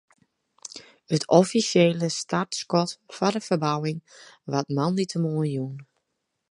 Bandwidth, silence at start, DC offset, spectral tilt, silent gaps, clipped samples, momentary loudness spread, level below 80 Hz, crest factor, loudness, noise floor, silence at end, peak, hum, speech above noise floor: 11.5 kHz; 0.65 s; under 0.1%; -5.5 dB/octave; none; under 0.1%; 21 LU; -70 dBFS; 24 dB; -24 LUFS; -79 dBFS; 0.65 s; -2 dBFS; none; 55 dB